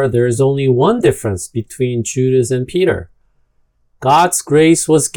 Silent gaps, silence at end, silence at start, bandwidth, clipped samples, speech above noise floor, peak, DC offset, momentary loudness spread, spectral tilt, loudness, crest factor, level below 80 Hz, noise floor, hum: none; 0.05 s; 0 s; 18 kHz; under 0.1%; 45 dB; 0 dBFS; under 0.1%; 10 LU; -5.5 dB/octave; -14 LUFS; 14 dB; -46 dBFS; -58 dBFS; none